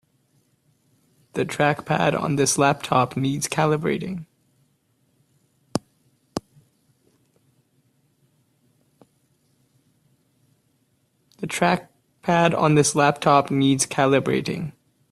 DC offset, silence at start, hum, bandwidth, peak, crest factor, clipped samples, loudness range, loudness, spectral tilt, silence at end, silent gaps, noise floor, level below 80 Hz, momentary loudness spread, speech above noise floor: under 0.1%; 1.35 s; none; 14.5 kHz; -2 dBFS; 22 dB; under 0.1%; 18 LU; -21 LUFS; -4.5 dB/octave; 0.4 s; none; -67 dBFS; -60 dBFS; 15 LU; 47 dB